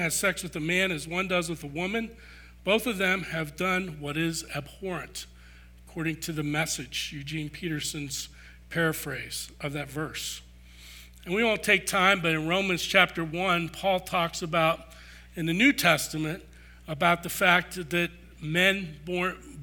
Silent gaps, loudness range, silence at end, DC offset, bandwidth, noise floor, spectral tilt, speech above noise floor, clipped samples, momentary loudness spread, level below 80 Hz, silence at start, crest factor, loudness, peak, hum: none; 8 LU; 0 s; under 0.1%; over 20 kHz; -50 dBFS; -3.5 dB/octave; 23 dB; under 0.1%; 14 LU; -52 dBFS; 0 s; 24 dB; -27 LUFS; -6 dBFS; 60 Hz at -50 dBFS